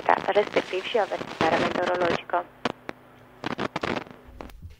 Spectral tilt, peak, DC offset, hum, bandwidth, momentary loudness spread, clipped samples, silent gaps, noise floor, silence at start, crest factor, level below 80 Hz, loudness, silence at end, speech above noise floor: -5 dB/octave; -4 dBFS; under 0.1%; none; 16 kHz; 19 LU; under 0.1%; none; -51 dBFS; 0 s; 24 dB; -54 dBFS; -26 LUFS; 0.05 s; 26 dB